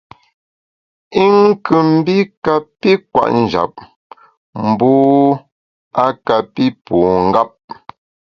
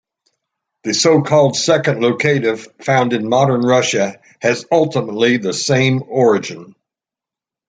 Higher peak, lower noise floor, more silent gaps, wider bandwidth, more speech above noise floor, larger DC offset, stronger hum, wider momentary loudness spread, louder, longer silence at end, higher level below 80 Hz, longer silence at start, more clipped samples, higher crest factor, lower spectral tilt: about the same, 0 dBFS vs -2 dBFS; about the same, under -90 dBFS vs -88 dBFS; first, 2.37-2.42 s, 3.96-4.10 s, 4.37-4.53 s, 5.52-5.91 s vs none; second, 6.8 kHz vs 9.6 kHz; first, over 77 dB vs 73 dB; neither; neither; first, 12 LU vs 8 LU; about the same, -14 LUFS vs -15 LUFS; second, 0.8 s vs 1 s; first, -48 dBFS vs -60 dBFS; first, 1.1 s vs 0.85 s; neither; about the same, 14 dB vs 14 dB; first, -8 dB/octave vs -4.5 dB/octave